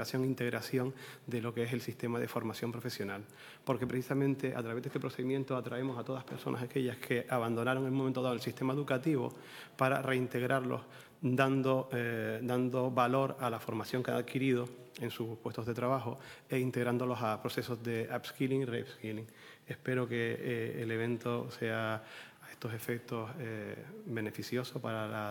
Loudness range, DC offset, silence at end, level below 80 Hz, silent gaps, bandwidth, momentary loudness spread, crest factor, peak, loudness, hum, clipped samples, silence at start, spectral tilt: 5 LU; under 0.1%; 0 s; -78 dBFS; none; 19 kHz; 10 LU; 22 dB; -12 dBFS; -36 LUFS; none; under 0.1%; 0 s; -6.5 dB/octave